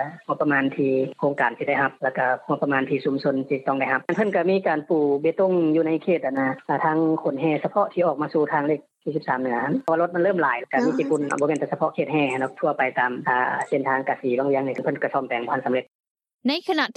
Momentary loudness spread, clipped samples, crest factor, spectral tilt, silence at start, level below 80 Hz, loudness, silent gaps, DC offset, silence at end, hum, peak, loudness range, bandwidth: 4 LU; under 0.1%; 16 dB; -6.5 dB/octave; 0 s; -78 dBFS; -23 LUFS; 15.95-15.99 s, 16.07-16.15 s, 16.34-16.39 s; under 0.1%; 0.05 s; none; -6 dBFS; 2 LU; 9.2 kHz